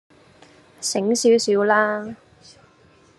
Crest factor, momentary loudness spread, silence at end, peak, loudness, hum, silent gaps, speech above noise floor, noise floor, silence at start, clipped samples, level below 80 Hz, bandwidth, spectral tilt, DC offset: 18 dB; 12 LU; 1.05 s; -4 dBFS; -19 LUFS; none; none; 35 dB; -54 dBFS; 0.8 s; under 0.1%; -70 dBFS; 12.5 kHz; -3 dB/octave; under 0.1%